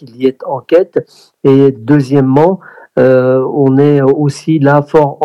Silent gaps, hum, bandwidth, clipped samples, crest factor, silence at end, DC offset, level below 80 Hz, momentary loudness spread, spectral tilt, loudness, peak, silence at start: none; none; 11.5 kHz; 0.9%; 10 dB; 0 s; under 0.1%; -50 dBFS; 8 LU; -8.5 dB/octave; -10 LUFS; 0 dBFS; 0 s